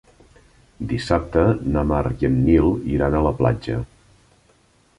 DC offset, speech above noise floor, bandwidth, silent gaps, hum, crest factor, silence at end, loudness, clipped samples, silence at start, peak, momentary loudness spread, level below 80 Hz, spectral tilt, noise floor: under 0.1%; 39 dB; 11 kHz; none; none; 18 dB; 1.15 s; -20 LUFS; under 0.1%; 0.8 s; -2 dBFS; 11 LU; -32 dBFS; -8.5 dB/octave; -58 dBFS